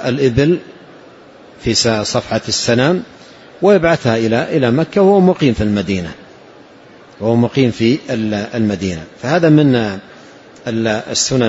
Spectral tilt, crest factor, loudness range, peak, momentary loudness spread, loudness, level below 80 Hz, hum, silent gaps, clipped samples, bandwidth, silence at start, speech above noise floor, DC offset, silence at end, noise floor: -5 dB/octave; 14 dB; 4 LU; 0 dBFS; 11 LU; -14 LUFS; -42 dBFS; none; none; under 0.1%; 8 kHz; 0 s; 27 dB; under 0.1%; 0 s; -41 dBFS